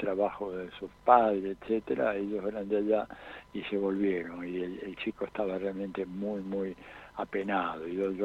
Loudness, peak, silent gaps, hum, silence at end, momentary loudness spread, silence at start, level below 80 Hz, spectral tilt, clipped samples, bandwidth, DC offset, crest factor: -32 LUFS; -8 dBFS; none; 50 Hz at -65 dBFS; 0 s; 11 LU; 0 s; -62 dBFS; -8 dB/octave; under 0.1%; 8.4 kHz; under 0.1%; 24 dB